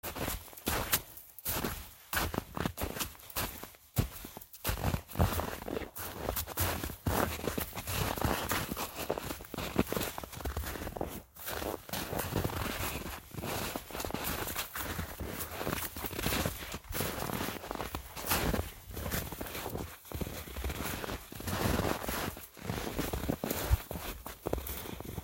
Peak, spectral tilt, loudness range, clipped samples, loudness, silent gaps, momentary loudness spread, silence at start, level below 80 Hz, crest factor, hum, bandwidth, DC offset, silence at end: -12 dBFS; -4 dB/octave; 3 LU; under 0.1%; -36 LUFS; none; 8 LU; 0.05 s; -44 dBFS; 24 dB; none; 17 kHz; under 0.1%; 0 s